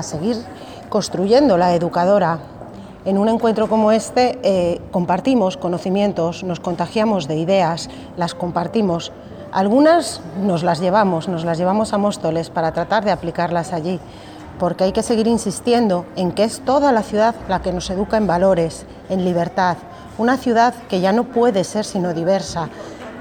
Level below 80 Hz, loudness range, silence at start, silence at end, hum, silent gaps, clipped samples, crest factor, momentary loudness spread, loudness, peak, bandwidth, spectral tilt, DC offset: -46 dBFS; 3 LU; 0 s; 0 s; none; none; under 0.1%; 16 dB; 10 LU; -18 LUFS; -2 dBFS; 18 kHz; -6 dB/octave; under 0.1%